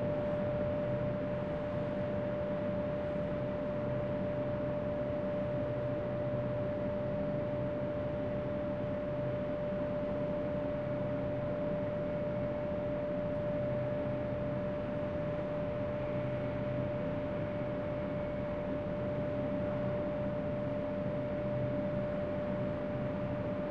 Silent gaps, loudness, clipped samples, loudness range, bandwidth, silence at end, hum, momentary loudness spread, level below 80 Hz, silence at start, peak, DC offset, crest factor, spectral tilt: none; -36 LUFS; under 0.1%; 1 LU; 6 kHz; 0 s; none; 2 LU; -54 dBFS; 0 s; -22 dBFS; 0.1%; 12 dB; -9.5 dB/octave